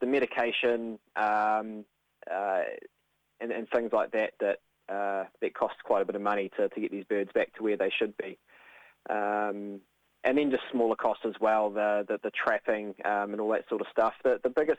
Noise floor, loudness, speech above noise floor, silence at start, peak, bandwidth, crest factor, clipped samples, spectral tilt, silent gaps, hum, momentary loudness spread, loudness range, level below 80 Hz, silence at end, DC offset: -56 dBFS; -30 LUFS; 27 dB; 0 s; -12 dBFS; 9 kHz; 18 dB; under 0.1%; -6 dB/octave; none; none; 10 LU; 3 LU; -74 dBFS; 0 s; under 0.1%